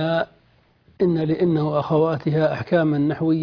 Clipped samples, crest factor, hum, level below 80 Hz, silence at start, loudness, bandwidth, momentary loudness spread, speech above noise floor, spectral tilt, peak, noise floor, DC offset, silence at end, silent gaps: under 0.1%; 16 dB; none; -56 dBFS; 0 s; -21 LUFS; 5.4 kHz; 4 LU; 39 dB; -9.5 dB/octave; -6 dBFS; -58 dBFS; under 0.1%; 0 s; none